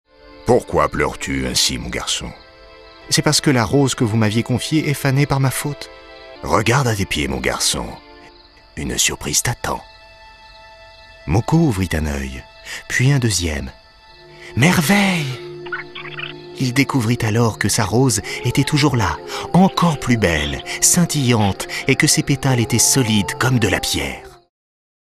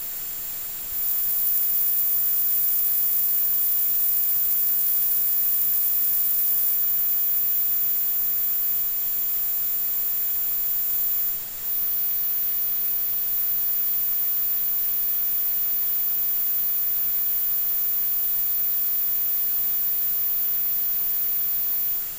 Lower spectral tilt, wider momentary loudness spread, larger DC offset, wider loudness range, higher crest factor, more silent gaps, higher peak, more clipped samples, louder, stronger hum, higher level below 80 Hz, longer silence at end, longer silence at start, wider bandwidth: first, -4 dB/octave vs 0 dB/octave; first, 14 LU vs 3 LU; second, under 0.1% vs 0.3%; about the same, 5 LU vs 3 LU; about the same, 18 dB vs 18 dB; neither; first, 0 dBFS vs -6 dBFS; neither; first, -17 LUFS vs -20 LUFS; neither; first, -38 dBFS vs -58 dBFS; first, 0.65 s vs 0 s; first, 0.25 s vs 0 s; about the same, 15.5 kHz vs 17 kHz